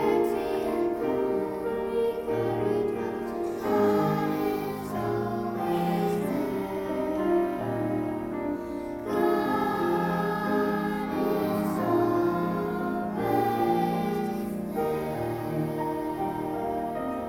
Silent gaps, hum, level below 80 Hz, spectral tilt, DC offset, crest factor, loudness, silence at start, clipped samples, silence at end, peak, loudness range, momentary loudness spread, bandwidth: none; none; -54 dBFS; -7.5 dB/octave; under 0.1%; 16 dB; -28 LUFS; 0 s; under 0.1%; 0 s; -12 dBFS; 2 LU; 6 LU; 17 kHz